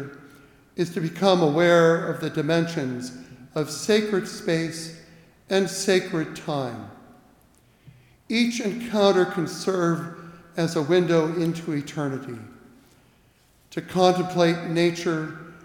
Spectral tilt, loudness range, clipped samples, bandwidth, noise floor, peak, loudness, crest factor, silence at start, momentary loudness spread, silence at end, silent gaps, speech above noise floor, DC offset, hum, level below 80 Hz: -5.5 dB/octave; 5 LU; under 0.1%; 18 kHz; -59 dBFS; -6 dBFS; -23 LUFS; 20 dB; 0 s; 16 LU; 0.05 s; none; 36 dB; under 0.1%; none; -64 dBFS